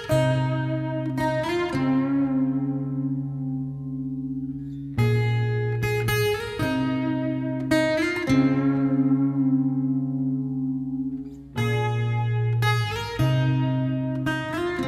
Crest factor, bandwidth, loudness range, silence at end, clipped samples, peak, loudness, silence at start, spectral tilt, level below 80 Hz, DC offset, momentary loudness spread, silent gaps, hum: 14 dB; 15 kHz; 4 LU; 0 s; under 0.1%; -8 dBFS; -25 LUFS; 0 s; -7 dB/octave; -48 dBFS; under 0.1%; 8 LU; none; none